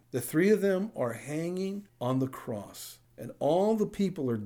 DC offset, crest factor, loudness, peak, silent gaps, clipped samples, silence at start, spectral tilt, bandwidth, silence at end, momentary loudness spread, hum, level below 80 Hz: under 0.1%; 16 dB; -30 LUFS; -14 dBFS; none; under 0.1%; 0.15 s; -6.5 dB/octave; over 20 kHz; 0 s; 17 LU; none; -68 dBFS